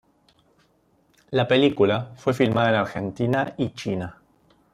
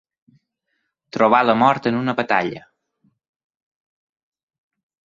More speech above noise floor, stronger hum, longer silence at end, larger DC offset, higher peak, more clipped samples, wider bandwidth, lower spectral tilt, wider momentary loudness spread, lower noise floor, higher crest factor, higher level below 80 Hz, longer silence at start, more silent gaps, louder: second, 41 dB vs 57 dB; neither; second, 0.6 s vs 2.55 s; neither; second, -6 dBFS vs -2 dBFS; neither; first, 13.5 kHz vs 7.6 kHz; about the same, -6.5 dB/octave vs -6.5 dB/octave; second, 10 LU vs 15 LU; second, -63 dBFS vs -74 dBFS; about the same, 18 dB vs 20 dB; first, -58 dBFS vs -64 dBFS; first, 1.3 s vs 1.15 s; neither; second, -23 LUFS vs -18 LUFS